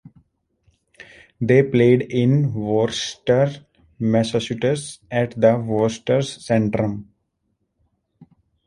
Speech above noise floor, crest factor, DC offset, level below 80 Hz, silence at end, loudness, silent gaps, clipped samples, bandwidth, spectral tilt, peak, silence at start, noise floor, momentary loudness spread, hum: 53 dB; 18 dB; under 0.1%; -54 dBFS; 0.45 s; -20 LUFS; none; under 0.1%; 11.5 kHz; -6.5 dB/octave; -2 dBFS; 1.4 s; -72 dBFS; 10 LU; none